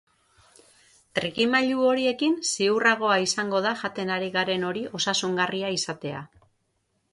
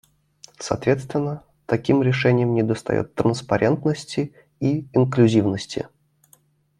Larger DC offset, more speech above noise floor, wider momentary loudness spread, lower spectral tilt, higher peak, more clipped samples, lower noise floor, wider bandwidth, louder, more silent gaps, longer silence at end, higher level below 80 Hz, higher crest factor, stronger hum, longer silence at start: neither; first, 48 dB vs 38 dB; second, 9 LU vs 13 LU; second, -3 dB/octave vs -7 dB/octave; second, -8 dBFS vs -4 dBFS; neither; first, -73 dBFS vs -59 dBFS; about the same, 11.5 kHz vs 11.5 kHz; about the same, -24 LUFS vs -22 LUFS; neither; about the same, 0.85 s vs 0.95 s; second, -68 dBFS vs -56 dBFS; about the same, 18 dB vs 18 dB; neither; first, 1.15 s vs 0.6 s